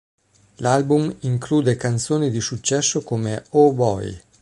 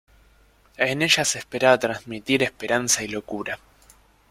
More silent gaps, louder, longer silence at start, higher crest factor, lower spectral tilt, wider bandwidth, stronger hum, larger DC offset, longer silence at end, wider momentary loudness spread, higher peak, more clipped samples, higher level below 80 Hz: neither; about the same, -20 LUFS vs -22 LUFS; second, 0.6 s vs 0.8 s; about the same, 18 dB vs 22 dB; first, -5 dB/octave vs -2.5 dB/octave; second, 11.5 kHz vs 16 kHz; neither; neither; second, 0.25 s vs 0.75 s; second, 8 LU vs 12 LU; about the same, -2 dBFS vs -4 dBFS; neither; first, -52 dBFS vs -58 dBFS